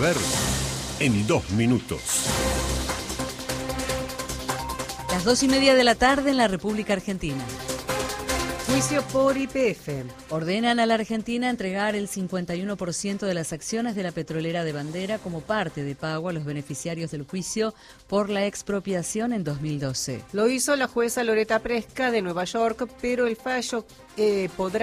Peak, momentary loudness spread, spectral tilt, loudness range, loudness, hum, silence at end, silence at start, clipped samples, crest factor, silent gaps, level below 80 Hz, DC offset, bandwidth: -6 dBFS; 9 LU; -4 dB/octave; 7 LU; -25 LUFS; none; 0 s; 0 s; under 0.1%; 20 dB; none; -44 dBFS; under 0.1%; 15.5 kHz